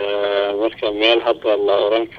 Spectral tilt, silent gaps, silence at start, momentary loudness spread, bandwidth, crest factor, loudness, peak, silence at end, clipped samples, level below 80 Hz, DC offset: -5 dB/octave; none; 0 s; 5 LU; 6.4 kHz; 16 dB; -17 LUFS; -2 dBFS; 0 s; under 0.1%; -54 dBFS; under 0.1%